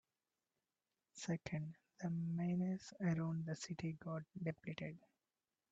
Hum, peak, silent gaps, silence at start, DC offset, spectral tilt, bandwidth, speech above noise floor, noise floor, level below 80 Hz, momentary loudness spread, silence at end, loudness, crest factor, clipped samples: none; -28 dBFS; none; 1.15 s; under 0.1%; -6.5 dB/octave; 8 kHz; over 47 dB; under -90 dBFS; -78 dBFS; 10 LU; 0.75 s; -44 LUFS; 16 dB; under 0.1%